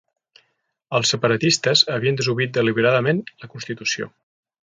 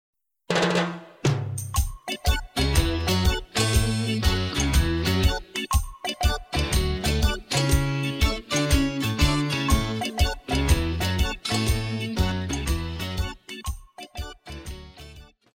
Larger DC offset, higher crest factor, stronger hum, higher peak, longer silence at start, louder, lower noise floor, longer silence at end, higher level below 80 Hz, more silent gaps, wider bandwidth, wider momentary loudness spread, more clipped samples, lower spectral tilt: neither; about the same, 20 dB vs 18 dB; neither; first, 0 dBFS vs -6 dBFS; first, 0.9 s vs 0.5 s; first, -19 LUFS vs -25 LUFS; first, -71 dBFS vs -47 dBFS; first, 0.6 s vs 0.3 s; second, -62 dBFS vs -28 dBFS; neither; second, 9.6 kHz vs 17 kHz; about the same, 14 LU vs 12 LU; neither; about the same, -4 dB/octave vs -4.5 dB/octave